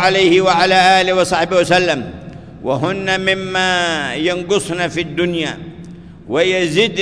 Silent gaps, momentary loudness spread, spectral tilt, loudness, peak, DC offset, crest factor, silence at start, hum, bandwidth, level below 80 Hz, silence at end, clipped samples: none; 14 LU; -4 dB/octave; -15 LUFS; 0 dBFS; under 0.1%; 14 dB; 0 s; none; 11 kHz; -46 dBFS; 0 s; under 0.1%